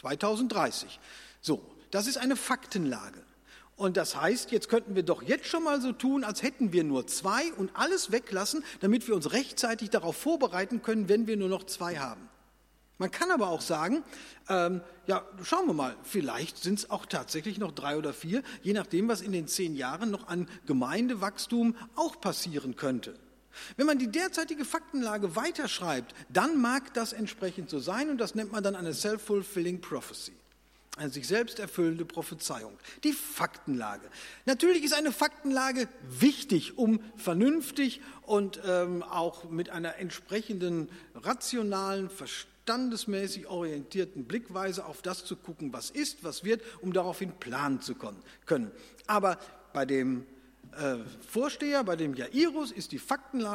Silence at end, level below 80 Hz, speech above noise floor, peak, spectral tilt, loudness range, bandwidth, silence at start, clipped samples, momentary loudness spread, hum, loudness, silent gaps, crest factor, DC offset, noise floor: 0 s; -66 dBFS; 33 dB; -10 dBFS; -4 dB/octave; 5 LU; 16.5 kHz; 0.05 s; under 0.1%; 10 LU; none; -31 LUFS; none; 22 dB; under 0.1%; -64 dBFS